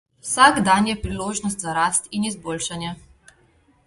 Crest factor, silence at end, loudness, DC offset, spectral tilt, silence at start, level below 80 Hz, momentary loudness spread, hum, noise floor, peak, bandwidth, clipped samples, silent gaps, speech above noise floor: 22 dB; 0.9 s; -20 LUFS; under 0.1%; -3 dB/octave; 0.25 s; -46 dBFS; 13 LU; none; -58 dBFS; 0 dBFS; 12 kHz; under 0.1%; none; 38 dB